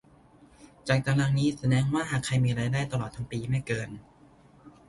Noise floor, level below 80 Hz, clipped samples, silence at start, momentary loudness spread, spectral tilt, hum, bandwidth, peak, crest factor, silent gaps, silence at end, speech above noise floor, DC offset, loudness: -57 dBFS; -54 dBFS; under 0.1%; 0.6 s; 10 LU; -6 dB/octave; none; 11.5 kHz; -10 dBFS; 20 dB; none; 0.2 s; 30 dB; under 0.1%; -28 LUFS